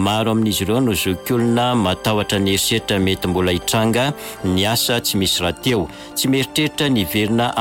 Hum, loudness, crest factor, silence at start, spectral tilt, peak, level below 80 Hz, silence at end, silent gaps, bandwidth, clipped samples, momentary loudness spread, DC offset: none; -18 LUFS; 12 dB; 0 s; -4 dB/octave; -6 dBFS; -42 dBFS; 0 s; none; 17 kHz; under 0.1%; 3 LU; under 0.1%